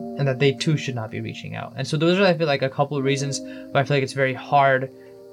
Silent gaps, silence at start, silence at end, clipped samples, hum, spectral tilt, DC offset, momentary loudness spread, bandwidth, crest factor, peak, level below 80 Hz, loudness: none; 0 s; 0 s; under 0.1%; none; -5.5 dB/octave; under 0.1%; 13 LU; 11.5 kHz; 16 dB; -6 dBFS; -70 dBFS; -22 LUFS